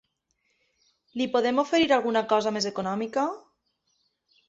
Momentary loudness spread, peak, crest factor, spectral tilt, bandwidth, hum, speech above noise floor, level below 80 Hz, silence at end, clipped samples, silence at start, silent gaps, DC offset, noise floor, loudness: 9 LU; -10 dBFS; 18 dB; -4 dB/octave; 8 kHz; none; 50 dB; -68 dBFS; 1.1 s; under 0.1%; 1.15 s; none; under 0.1%; -74 dBFS; -25 LUFS